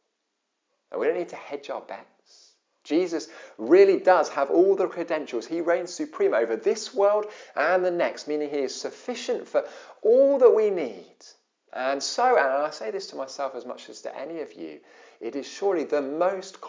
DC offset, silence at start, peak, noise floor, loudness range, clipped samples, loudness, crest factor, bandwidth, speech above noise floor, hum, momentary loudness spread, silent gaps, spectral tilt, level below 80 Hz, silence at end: under 0.1%; 0.9 s; -6 dBFS; -79 dBFS; 9 LU; under 0.1%; -24 LUFS; 20 dB; 7.6 kHz; 54 dB; none; 18 LU; none; -4 dB/octave; under -90 dBFS; 0 s